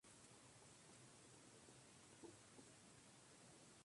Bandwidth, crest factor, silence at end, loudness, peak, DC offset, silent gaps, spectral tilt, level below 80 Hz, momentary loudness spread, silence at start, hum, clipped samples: 11.5 kHz; 18 dB; 0 s; -65 LUFS; -48 dBFS; under 0.1%; none; -3 dB/octave; -88 dBFS; 2 LU; 0.05 s; none; under 0.1%